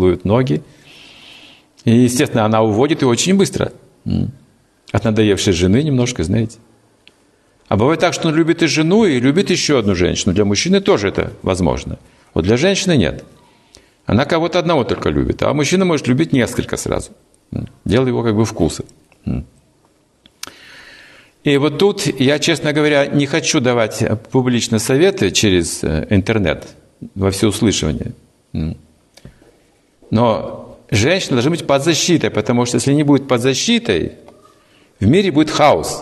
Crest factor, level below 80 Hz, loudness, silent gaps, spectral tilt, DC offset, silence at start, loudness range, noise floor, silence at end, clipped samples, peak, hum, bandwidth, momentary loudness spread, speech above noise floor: 14 dB; -40 dBFS; -15 LUFS; none; -5 dB/octave; under 0.1%; 0 s; 6 LU; -56 dBFS; 0 s; under 0.1%; -2 dBFS; none; 12.5 kHz; 12 LU; 41 dB